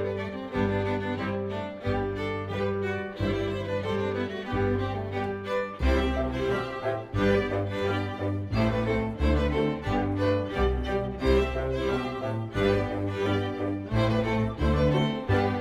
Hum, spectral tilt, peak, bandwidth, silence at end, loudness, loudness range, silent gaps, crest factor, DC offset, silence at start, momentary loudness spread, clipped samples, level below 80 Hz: none; -7.5 dB/octave; -12 dBFS; 11.5 kHz; 0 s; -28 LUFS; 3 LU; none; 14 dB; under 0.1%; 0 s; 6 LU; under 0.1%; -36 dBFS